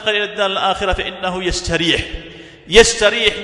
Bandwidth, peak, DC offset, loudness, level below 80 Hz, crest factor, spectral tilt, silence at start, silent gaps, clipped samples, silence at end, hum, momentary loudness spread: 12 kHz; 0 dBFS; under 0.1%; -15 LUFS; -32 dBFS; 16 dB; -2.5 dB/octave; 0 s; none; 0.3%; 0 s; none; 12 LU